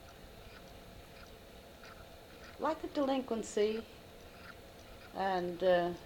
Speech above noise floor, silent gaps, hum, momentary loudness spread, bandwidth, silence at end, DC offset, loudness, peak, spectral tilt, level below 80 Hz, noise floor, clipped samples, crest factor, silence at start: 20 dB; none; none; 21 LU; 18 kHz; 0 s; under 0.1%; -35 LUFS; -20 dBFS; -5 dB/octave; -62 dBFS; -54 dBFS; under 0.1%; 18 dB; 0 s